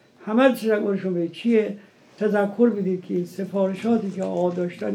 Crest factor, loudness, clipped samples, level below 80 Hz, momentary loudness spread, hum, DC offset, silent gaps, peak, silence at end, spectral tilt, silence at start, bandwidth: 18 dB; -23 LUFS; under 0.1%; -84 dBFS; 8 LU; none; under 0.1%; none; -4 dBFS; 0 s; -7.5 dB/octave; 0.2 s; 16 kHz